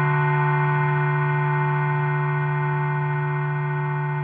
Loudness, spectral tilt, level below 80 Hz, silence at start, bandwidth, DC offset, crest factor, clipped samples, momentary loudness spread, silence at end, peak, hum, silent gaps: -22 LUFS; -7.5 dB/octave; -64 dBFS; 0 s; 3.5 kHz; under 0.1%; 12 dB; under 0.1%; 4 LU; 0 s; -10 dBFS; none; none